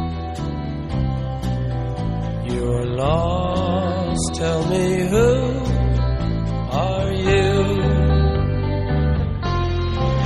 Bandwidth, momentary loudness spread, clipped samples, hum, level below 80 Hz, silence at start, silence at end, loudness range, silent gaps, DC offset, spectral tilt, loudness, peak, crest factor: 12 kHz; 7 LU; under 0.1%; none; -26 dBFS; 0 s; 0 s; 3 LU; none; under 0.1%; -6.5 dB/octave; -21 LUFS; -6 dBFS; 14 dB